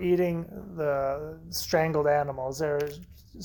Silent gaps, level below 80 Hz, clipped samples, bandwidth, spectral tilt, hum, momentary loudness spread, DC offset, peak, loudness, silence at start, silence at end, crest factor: none; -52 dBFS; under 0.1%; 19 kHz; -5.5 dB/octave; none; 11 LU; under 0.1%; -12 dBFS; -28 LUFS; 0 s; 0 s; 16 dB